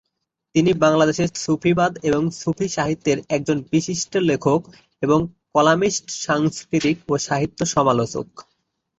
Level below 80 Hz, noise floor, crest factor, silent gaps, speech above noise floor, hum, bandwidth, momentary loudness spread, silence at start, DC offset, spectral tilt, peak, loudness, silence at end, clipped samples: -52 dBFS; -78 dBFS; 18 dB; none; 58 dB; none; 8.2 kHz; 7 LU; 0.55 s; under 0.1%; -5 dB/octave; -2 dBFS; -20 LUFS; 0.6 s; under 0.1%